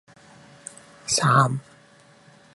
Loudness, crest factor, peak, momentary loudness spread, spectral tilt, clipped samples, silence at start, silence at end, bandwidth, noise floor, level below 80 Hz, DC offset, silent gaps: -21 LUFS; 22 dB; -4 dBFS; 23 LU; -4 dB/octave; under 0.1%; 1.05 s; 0.95 s; 11.5 kHz; -53 dBFS; -62 dBFS; under 0.1%; none